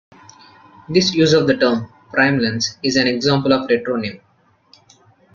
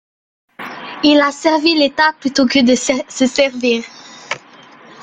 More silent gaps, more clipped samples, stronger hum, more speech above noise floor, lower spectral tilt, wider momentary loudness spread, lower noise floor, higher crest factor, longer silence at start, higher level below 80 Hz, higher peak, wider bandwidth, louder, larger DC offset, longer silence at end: neither; neither; neither; first, 37 dB vs 28 dB; first, -4.5 dB/octave vs -2.5 dB/octave; second, 9 LU vs 17 LU; first, -53 dBFS vs -42 dBFS; about the same, 18 dB vs 16 dB; first, 0.9 s vs 0.6 s; about the same, -56 dBFS vs -56 dBFS; about the same, -2 dBFS vs 0 dBFS; second, 7.4 kHz vs 9.4 kHz; second, -17 LUFS vs -14 LUFS; neither; first, 1.2 s vs 0 s